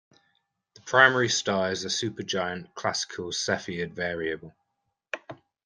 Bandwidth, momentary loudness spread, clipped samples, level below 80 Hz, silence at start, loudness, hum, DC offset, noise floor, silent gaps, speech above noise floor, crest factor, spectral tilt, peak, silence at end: 10.5 kHz; 19 LU; under 0.1%; -68 dBFS; 0.85 s; -26 LUFS; none; under 0.1%; -80 dBFS; none; 53 dB; 26 dB; -3 dB/octave; -2 dBFS; 0.3 s